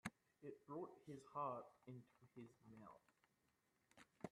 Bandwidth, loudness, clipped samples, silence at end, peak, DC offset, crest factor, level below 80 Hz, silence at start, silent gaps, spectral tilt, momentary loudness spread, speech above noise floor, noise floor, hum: 12.5 kHz; -56 LUFS; under 0.1%; 0.05 s; -32 dBFS; under 0.1%; 24 dB; under -90 dBFS; 0.05 s; none; -6 dB/octave; 15 LU; 30 dB; -85 dBFS; none